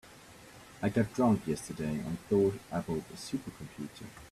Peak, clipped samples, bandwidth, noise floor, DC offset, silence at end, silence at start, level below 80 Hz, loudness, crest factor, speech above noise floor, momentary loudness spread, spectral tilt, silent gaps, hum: -14 dBFS; under 0.1%; 14.5 kHz; -54 dBFS; under 0.1%; 0.05 s; 0.05 s; -60 dBFS; -33 LUFS; 18 dB; 21 dB; 23 LU; -6.5 dB/octave; none; none